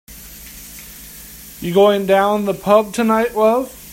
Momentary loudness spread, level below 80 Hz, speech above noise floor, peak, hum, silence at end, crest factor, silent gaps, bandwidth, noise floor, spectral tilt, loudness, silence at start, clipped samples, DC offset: 21 LU; -46 dBFS; 22 dB; 0 dBFS; none; 0 s; 18 dB; none; 16.5 kHz; -37 dBFS; -5 dB/octave; -15 LUFS; 0.1 s; under 0.1%; under 0.1%